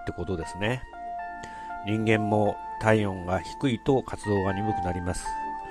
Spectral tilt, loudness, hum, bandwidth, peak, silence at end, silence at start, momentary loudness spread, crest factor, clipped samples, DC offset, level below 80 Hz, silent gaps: -6.5 dB/octave; -28 LUFS; none; 13 kHz; -6 dBFS; 0 s; 0 s; 12 LU; 20 dB; under 0.1%; under 0.1%; -46 dBFS; none